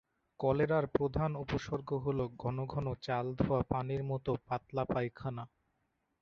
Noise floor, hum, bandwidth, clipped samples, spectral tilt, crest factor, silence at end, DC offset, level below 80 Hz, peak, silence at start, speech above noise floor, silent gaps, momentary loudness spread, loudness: -81 dBFS; none; 7 kHz; under 0.1%; -7 dB/octave; 22 dB; 0.75 s; under 0.1%; -56 dBFS; -14 dBFS; 0.4 s; 46 dB; none; 7 LU; -35 LUFS